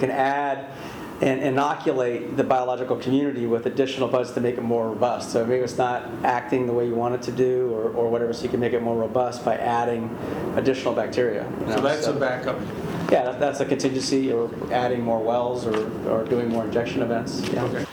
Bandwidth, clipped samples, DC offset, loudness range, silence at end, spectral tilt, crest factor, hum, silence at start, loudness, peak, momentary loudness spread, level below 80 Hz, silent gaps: 20 kHz; under 0.1%; under 0.1%; 1 LU; 0 s; -6 dB/octave; 20 dB; none; 0 s; -24 LUFS; -4 dBFS; 4 LU; -56 dBFS; none